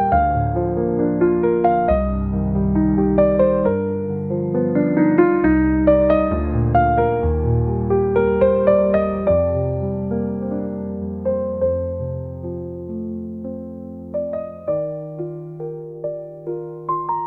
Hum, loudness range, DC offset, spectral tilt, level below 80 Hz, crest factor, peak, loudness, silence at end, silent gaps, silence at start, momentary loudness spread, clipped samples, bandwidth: none; 11 LU; 0.1%; -12 dB/octave; -32 dBFS; 16 dB; -2 dBFS; -19 LUFS; 0 s; none; 0 s; 14 LU; under 0.1%; 4.1 kHz